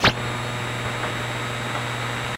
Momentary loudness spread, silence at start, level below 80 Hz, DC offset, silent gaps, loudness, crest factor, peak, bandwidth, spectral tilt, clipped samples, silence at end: 1 LU; 0 s; -44 dBFS; under 0.1%; none; -26 LUFS; 22 dB; -4 dBFS; 16 kHz; -4 dB/octave; under 0.1%; 0 s